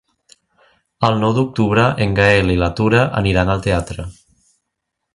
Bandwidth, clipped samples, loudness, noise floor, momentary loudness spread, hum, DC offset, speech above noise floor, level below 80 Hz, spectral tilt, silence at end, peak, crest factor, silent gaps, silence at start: 11.5 kHz; under 0.1%; -16 LUFS; -77 dBFS; 8 LU; none; under 0.1%; 62 dB; -34 dBFS; -6.5 dB/octave; 1 s; 0 dBFS; 18 dB; none; 1 s